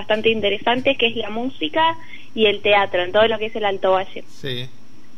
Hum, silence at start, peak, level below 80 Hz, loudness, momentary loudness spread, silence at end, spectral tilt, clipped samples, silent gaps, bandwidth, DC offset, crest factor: none; 0 s; -4 dBFS; -56 dBFS; -19 LUFS; 14 LU; 0.5 s; -5.5 dB/octave; under 0.1%; none; 12 kHz; 4%; 16 dB